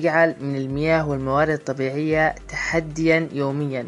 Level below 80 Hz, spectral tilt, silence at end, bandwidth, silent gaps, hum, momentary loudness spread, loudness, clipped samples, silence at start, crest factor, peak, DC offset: -44 dBFS; -6.5 dB/octave; 0 s; 11 kHz; none; none; 6 LU; -22 LUFS; under 0.1%; 0 s; 18 dB; -4 dBFS; under 0.1%